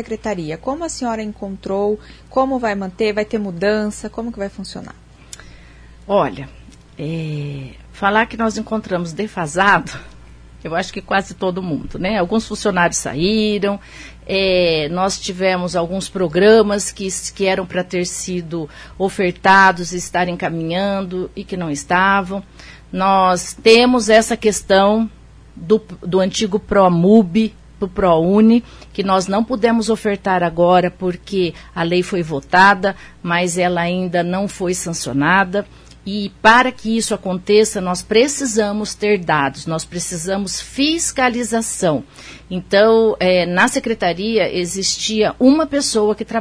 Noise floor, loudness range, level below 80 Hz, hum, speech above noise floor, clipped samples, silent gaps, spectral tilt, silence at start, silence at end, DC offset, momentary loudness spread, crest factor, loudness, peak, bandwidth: -41 dBFS; 6 LU; -42 dBFS; none; 24 dB; under 0.1%; none; -4.5 dB/octave; 0 s; 0 s; under 0.1%; 14 LU; 18 dB; -17 LUFS; 0 dBFS; 11 kHz